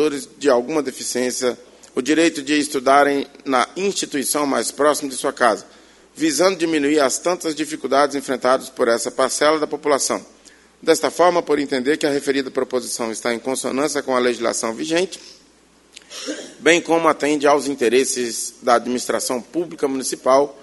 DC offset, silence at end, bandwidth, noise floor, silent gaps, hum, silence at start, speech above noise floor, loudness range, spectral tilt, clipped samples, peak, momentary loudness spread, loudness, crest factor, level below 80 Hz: under 0.1%; 0 s; 12 kHz; -53 dBFS; none; none; 0 s; 34 dB; 3 LU; -2.5 dB/octave; under 0.1%; 0 dBFS; 8 LU; -19 LUFS; 20 dB; -62 dBFS